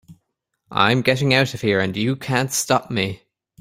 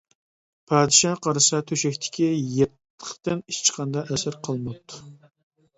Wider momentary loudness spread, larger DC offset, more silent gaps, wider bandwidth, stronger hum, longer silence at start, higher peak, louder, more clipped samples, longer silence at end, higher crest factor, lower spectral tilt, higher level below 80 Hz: second, 8 LU vs 19 LU; neither; second, none vs 2.90-2.98 s; first, 16 kHz vs 8.4 kHz; neither; second, 0.1 s vs 0.7 s; about the same, 0 dBFS vs -2 dBFS; first, -19 LUFS vs -22 LUFS; neither; second, 0.45 s vs 0.65 s; about the same, 20 dB vs 22 dB; about the same, -4.5 dB/octave vs -3.5 dB/octave; about the same, -56 dBFS vs -60 dBFS